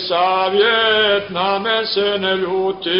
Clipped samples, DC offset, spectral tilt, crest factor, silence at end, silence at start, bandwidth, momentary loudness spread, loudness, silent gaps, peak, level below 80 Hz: under 0.1%; 0.1%; -7.5 dB/octave; 12 dB; 0 s; 0 s; 5.6 kHz; 5 LU; -16 LUFS; none; -4 dBFS; -58 dBFS